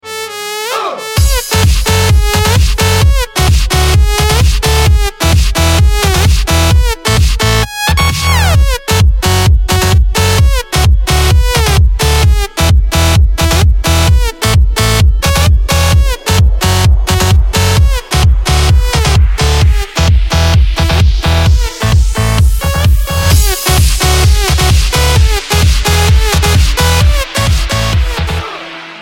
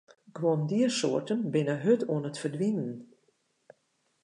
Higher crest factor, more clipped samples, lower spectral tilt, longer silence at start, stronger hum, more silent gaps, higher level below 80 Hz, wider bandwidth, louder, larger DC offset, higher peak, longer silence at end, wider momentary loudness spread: second, 8 dB vs 18 dB; neither; second, -4 dB/octave vs -6 dB/octave; second, 0.05 s vs 0.35 s; neither; neither; first, -12 dBFS vs -80 dBFS; first, 17 kHz vs 11 kHz; first, -10 LUFS vs -29 LUFS; neither; first, 0 dBFS vs -12 dBFS; second, 0 s vs 1.2 s; second, 3 LU vs 9 LU